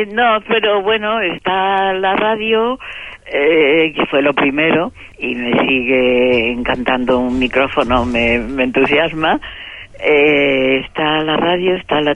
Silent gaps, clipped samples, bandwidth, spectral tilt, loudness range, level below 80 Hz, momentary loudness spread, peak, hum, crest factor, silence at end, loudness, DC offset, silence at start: none; under 0.1%; 9.4 kHz; -6 dB/octave; 1 LU; -38 dBFS; 8 LU; 0 dBFS; none; 14 dB; 0 s; -14 LUFS; under 0.1%; 0 s